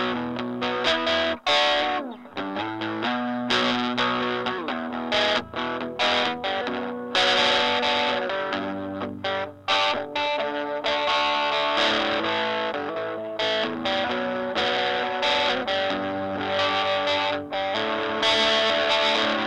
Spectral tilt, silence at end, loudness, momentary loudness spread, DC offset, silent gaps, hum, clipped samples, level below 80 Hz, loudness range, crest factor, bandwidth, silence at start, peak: -3 dB/octave; 0 s; -24 LUFS; 9 LU; under 0.1%; none; none; under 0.1%; -60 dBFS; 2 LU; 20 dB; 11 kHz; 0 s; -6 dBFS